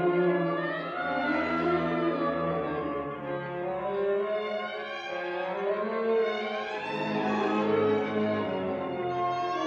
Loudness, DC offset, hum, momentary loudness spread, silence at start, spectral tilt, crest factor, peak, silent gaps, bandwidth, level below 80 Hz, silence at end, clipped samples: -29 LUFS; under 0.1%; none; 7 LU; 0 s; -7 dB/octave; 14 dB; -14 dBFS; none; 7.4 kHz; -64 dBFS; 0 s; under 0.1%